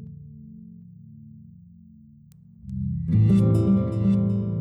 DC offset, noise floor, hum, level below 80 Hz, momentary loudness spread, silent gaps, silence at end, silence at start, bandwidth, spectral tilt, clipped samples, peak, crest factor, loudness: under 0.1%; -50 dBFS; none; -44 dBFS; 25 LU; none; 0 s; 0 s; 5.2 kHz; -10.5 dB/octave; under 0.1%; -10 dBFS; 14 dB; -22 LUFS